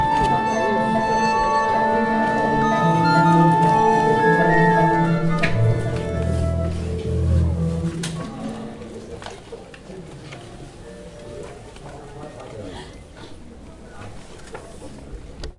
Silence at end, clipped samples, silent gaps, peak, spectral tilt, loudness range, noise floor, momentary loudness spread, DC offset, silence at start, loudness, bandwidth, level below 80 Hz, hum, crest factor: 0.05 s; under 0.1%; none; -4 dBFS; -6.5 dB/octave; 21 LU; -40 dBFS; 23 LU; under 0.1%; 0 s; -19 LUFS; 11.5 kHz; -38 dBFS; none; 16 dB